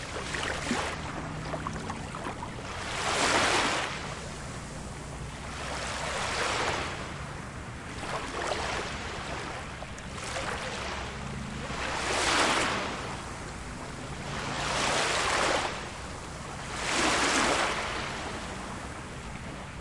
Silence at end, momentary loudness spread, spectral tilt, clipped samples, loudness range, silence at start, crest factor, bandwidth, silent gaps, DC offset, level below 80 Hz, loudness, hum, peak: 0 s; 14 LU; -3 dB/octave; under 0.1%; 6 LU; 0 s; 20 dB; 11.5 kHz; none; under 0.1%; -46 dBFS; -31 LUFS; none; -12 dBFS